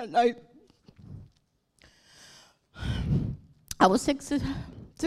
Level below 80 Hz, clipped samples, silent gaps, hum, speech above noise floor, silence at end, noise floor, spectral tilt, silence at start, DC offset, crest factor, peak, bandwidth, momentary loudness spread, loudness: -46 dBFS; under 0.1%; none; none; 44 dB; 0 s; -70 dBFS; -5.5 dB/octave; 0 s; under 0.1%; 24 dB; -6 dBFS; 15.5 kHz; 25 LU; -28 LUFS